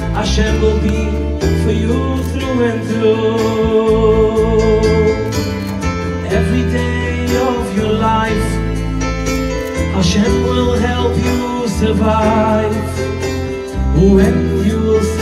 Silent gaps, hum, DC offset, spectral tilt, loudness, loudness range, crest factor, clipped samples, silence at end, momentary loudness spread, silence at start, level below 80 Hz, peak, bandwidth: none; none; under 0.1%; -6.5 dB/octave; -15 LUFS; 2 LU; 14 dB; under 0.1%; 0 s; 7 LU; 0 s; -22 dBFS; 0 dBFS; 14.5 kHz